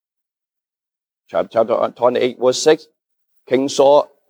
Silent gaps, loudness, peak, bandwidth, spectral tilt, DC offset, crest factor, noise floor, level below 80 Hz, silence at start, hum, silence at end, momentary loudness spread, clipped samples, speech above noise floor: none; -16 LUFS; -2 dBFS; 12.5 kHz; -4 dB/octave; under 0.1%; 16 dB; -89 dBFS; -72 dBFS; 1.35 s; none; 0.25 s; 8 LU; under 0.1%; 73 dB